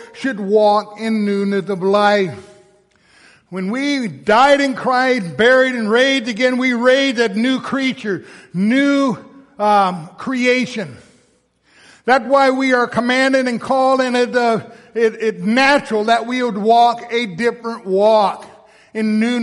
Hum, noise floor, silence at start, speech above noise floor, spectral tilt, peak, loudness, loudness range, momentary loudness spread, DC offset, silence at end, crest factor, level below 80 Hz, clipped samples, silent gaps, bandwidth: none; -58 dBFS; 0 s; 43 dB; -5 dB/octave; -2 dBFS; -16 LUFS; 4 LU; 11 LU; under 0.1%; 0 s; 14 dB; -60 dBFS; under 0.1%; none; 11.5 kHz